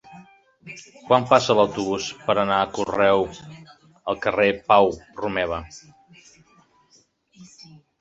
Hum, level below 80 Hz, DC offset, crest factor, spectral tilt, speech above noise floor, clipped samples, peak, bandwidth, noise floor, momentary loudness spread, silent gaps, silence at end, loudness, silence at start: none; -54 dBFS; under 0.1%; 22 dB; -4.5 dB/octave; 39 dB; under 0.1%; -2 dBFS; 8 kHz; -60 dBFS; 23 LU; none; 0.55 s; -21 LUFS; 0.1 s